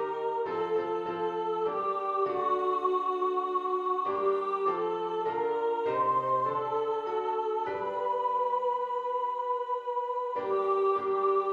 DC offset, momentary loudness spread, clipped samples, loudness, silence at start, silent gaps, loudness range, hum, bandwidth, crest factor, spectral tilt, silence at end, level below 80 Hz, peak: under 0.1%; 5 LU; under 0.1%; -30 LUFS; 0 s; none; 1 LU; none; 7 kHz; 12 dB; -7 dB/octave; 0 s; -76 dBFS; -16 dBFS